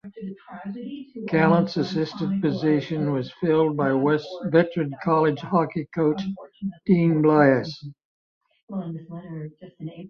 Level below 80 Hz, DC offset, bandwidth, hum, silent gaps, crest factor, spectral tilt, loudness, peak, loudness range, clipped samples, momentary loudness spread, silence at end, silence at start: -62 dBFS; under 0.1%; 6.8 kHz; none; 8.05-8.41 s, 8.63-8.68 s; 20 dB; -8.5 dB/octave; -22 LUFS; -4 dBFS; 2 LU; under 0.1%; 18 LU; 0 s; 0.05 s